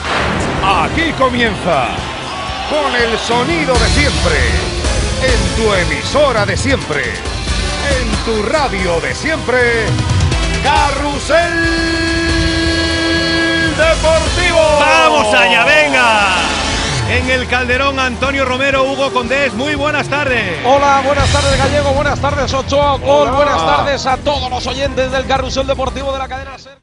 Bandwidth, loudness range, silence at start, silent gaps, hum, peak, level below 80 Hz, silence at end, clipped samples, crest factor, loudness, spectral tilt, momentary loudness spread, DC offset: 11 kHz; 5 LU; 0 s; none; none; 0 dBFS; -24 dBFS; 0.1 s; under 0.1%; 14 dB; -13 LUFS; -4 dB/octave; 8 LU; under 0.1%